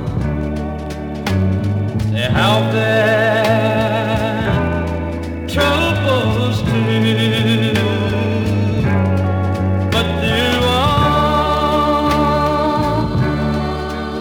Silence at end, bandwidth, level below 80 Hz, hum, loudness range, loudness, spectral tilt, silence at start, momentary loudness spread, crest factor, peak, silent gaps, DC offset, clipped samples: 0 s; 18.5 kHz; -32 dBFS; none; 2 LU; -16 LUFS; -6.5 dB/octave; 0 s; 8 LU; 14 dB; -2 dBFS; none; under 0.1%; under 0.1%